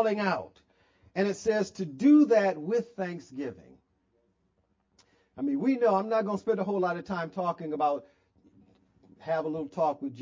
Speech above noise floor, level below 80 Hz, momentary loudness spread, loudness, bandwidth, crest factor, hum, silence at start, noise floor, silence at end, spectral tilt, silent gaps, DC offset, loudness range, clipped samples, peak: 45 dB; -70 dBFS; 14 LU; -28 LUFS; 7.6 kHz; 18 dB; none; 0 s; -73 dBFS; 0 s; -6.5 dB/octave; none; under 0.1%; 6 LU; under 0.1%; -12 dBFS